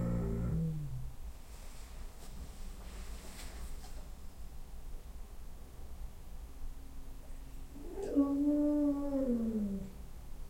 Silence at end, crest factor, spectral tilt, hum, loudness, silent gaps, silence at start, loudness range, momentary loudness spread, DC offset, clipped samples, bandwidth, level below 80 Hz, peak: 0 s; 18 dB; -7.5 dB/octave; none; -36 LUFS; none; 0 s; 17 LU; 21 LU; under 0.1%; under 0.1%; 16.5 kHz; -46 dBFS; -20 dBFS